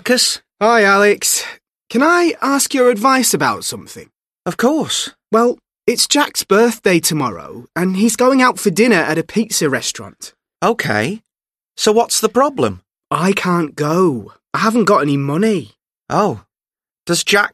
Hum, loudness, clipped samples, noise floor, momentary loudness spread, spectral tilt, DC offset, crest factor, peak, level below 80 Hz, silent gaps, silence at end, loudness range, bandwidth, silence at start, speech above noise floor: none; -15 LUFS; under 0.1%; under -90 dBFS; 12 LU; -3.5 dB/octave; under 0.1%; 16 dB; 0 dBFS; -58 dBFS; none; 0.05 s; 4 LU; 13.5 kHz; 0.05 s; over 75 dB